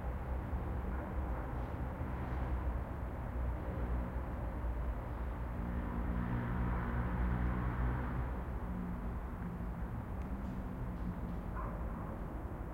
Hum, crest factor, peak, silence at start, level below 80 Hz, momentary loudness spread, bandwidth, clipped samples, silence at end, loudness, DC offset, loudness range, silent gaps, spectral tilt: none; 14 dB; -24 dBFS; 0 s; -40 dBFS; 6 LU; 15 kHz; under 0.1%; 0 s; -41 LUFS; under 0.1%; 4 LU; none; -9 dB/octave